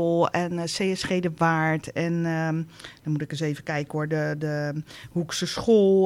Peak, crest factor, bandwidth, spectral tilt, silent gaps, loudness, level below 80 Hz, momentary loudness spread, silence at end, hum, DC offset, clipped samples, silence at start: -10 dBFS; 16 dB; 15 kHz; -6 dB/octave; none; -26 LUFS; -58 dBFS; 9 LU; 0 s; none; under 0.1%; under 0.1%; 0 s